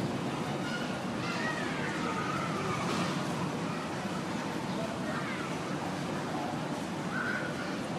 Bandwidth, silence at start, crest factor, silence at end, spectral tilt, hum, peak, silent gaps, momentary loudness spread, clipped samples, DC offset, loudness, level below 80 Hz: 14.5 kHz; 0 s; 14 dB; 0 s; -5 dB/octave; none; -20 dBFS; none; 3 LU; under 0.1%; under 0.1%; -34 LUFS; -62 dBFS